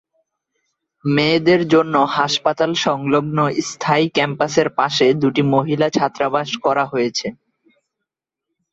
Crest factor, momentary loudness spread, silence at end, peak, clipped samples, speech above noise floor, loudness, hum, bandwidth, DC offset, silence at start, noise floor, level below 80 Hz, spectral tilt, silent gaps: 16 dB; 5 LU; 1.4 s; -2 dBFS; under 0.1%; 65 dB; -17 LUFS; none; 8 kHz; under 0.1%; 1.05 s; -82 dBFS; -60 dBFS; -5 dB/octave; none